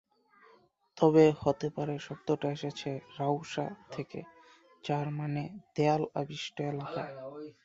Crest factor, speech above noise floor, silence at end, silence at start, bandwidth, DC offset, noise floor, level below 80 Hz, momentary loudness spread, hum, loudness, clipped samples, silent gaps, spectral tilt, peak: 22 dB; 33 dB; 0.15 s; 0.95 s; 7.8 kHz; under 0.1%; -65 dBFS; -68 dBFS; 16 LU; none; -32 LUFS; under 0.1%; none; -7 dB/octave; -10 dBFS